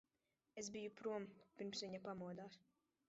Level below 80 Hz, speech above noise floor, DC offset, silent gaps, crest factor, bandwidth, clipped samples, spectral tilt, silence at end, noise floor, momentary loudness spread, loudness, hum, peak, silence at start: -86 dBFS; 39 dB; under 0.1%; none; 16 dB; 7.6 kHz; under 0.1%; -4 dB/octave; 0.5 s; -90 dBFS; 12 LU; -51 LUFS; none; -36 dBFS; 0.55 s